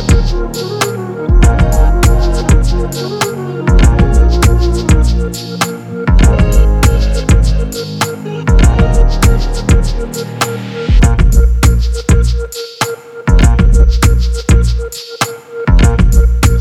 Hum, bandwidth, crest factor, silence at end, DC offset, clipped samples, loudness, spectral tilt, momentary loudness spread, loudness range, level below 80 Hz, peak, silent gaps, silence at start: none; 14.5 kHz; 10 dB; 0 s; under 0.1%; under 0.1%; -12 LUFS; -5.5 dB/octave; 9 LU; 1 LU; -10 dBFS; 0 dBFS; none; 0 s